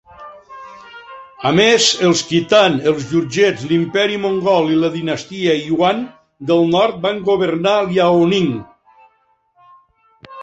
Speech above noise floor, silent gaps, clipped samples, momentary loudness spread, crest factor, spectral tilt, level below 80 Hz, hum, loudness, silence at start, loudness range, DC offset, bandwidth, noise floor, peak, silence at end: 45 dB; none; under 0.1%; 19 LU; 16 dB; -4.5 dB/octave; -56 dBFS; none; -15 LUFS; 0.2 s; 3 LU; under 0.1%; 8.2 kHz; -60 dBFS; 0 dBFS; 0 s